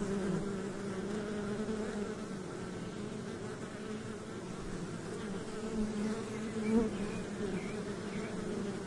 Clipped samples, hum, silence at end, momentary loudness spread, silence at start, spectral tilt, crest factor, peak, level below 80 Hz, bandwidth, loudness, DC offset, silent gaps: under 0.1%; none; 0 s; 7 LU; 0 s; -6 dB/octave; 18 dB; -20 dBFS; -56 dBFS; 11.5 kHz; -39 LUFS; under 0.1%; none